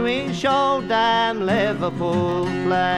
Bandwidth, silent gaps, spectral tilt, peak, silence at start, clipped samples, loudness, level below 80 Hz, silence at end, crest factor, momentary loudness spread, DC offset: 11.5 kHz; none; -5.5 dB/octave; -6 dBFS; 0 s; under 0.1%; -20 LUFS; -50 dBFS; 0 s; 14 dB; 4 LU; under 0.1%